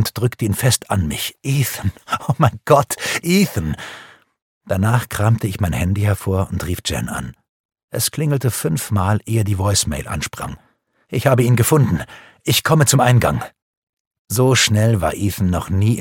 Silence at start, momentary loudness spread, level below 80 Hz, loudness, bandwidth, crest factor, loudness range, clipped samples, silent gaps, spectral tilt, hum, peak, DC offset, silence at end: 0 s; 13 LU; -40 dBFS; -18 LUFS; 17.5 kHz; 18 dB; 5 LU; under 0.1%; 4.42-4.61 s, 7.49-7.69 s, 7.83-7.88 s, 13.62-13.93 s, 14.00-14.11 s, 14.19-14.25 s; -5 dB/octave; none; 0 dBFS; under 0.1%; 0 s